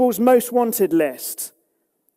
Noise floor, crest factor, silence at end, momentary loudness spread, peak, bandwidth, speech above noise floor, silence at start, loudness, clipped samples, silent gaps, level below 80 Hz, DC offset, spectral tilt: -69 dBFS; 16 dB; 0.7 s; 13 LU; -4 dBFS; 16 kHz; 51 dB; 0 s; -19 LUFS; under 0.1%; none; -68 dBFS; under 0.1%; -4.5 dB/octave